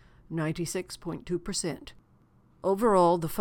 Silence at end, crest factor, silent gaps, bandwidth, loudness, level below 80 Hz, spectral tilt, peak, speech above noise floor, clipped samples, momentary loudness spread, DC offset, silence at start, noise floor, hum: 0 s; 18 dB; none; 18 kHz; -29 LUFS; -54 dBFS; -5 dB/octave; -10 dBFS; 34 dB; under 0.1%; 15 LU; under 0.1%; 0.3 s; -62 dBFS; none